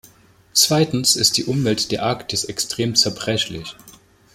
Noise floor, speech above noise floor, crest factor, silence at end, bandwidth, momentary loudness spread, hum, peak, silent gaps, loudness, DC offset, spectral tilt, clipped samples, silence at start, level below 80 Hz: -51 dBFS; 31 dB; 20 dB; 0.45 s; 16.5 kHz; 9 LU; none; 0 dBFS; none; -18 LUFS; under 0.1%; -3 dB/octave; under 0.1%; 0.55 s; -52 dBFS